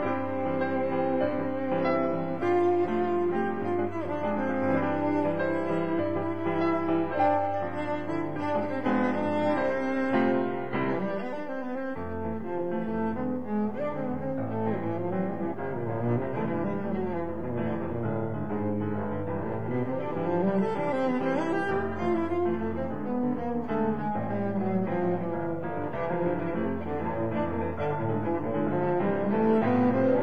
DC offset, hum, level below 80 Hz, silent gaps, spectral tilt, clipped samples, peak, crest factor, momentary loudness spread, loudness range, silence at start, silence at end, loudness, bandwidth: 1%; none; -58 dBFS; none; -9 dB/octave; under 0.1%; -14 dBFS; 14 dB; 6 LU; 4 LU; 0 s; 0 s; -29 LUFS; 8.2 kHz